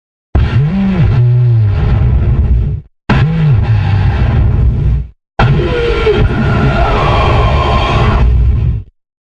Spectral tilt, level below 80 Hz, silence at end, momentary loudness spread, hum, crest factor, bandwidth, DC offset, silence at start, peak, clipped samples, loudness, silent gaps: -8.5 dB/octave; -14 dBFS; 0.4 s; 5 LU; none; 10 dB; 7.2 kHz; under 0.1%; 0.35 s; 0 dBFS; under 0.1%; -11 LUFS; none